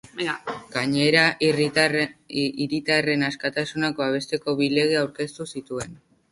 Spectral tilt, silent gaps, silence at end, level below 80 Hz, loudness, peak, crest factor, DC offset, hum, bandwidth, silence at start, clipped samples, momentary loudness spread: -4.5 dB/octave; none; 0.35 s; -62 dBFS; -23 LUFS; -2 dBFS; 20 dB; under 0.1%; none; 11.5 kHz; 0.15 s; under 0.1%; 13 LU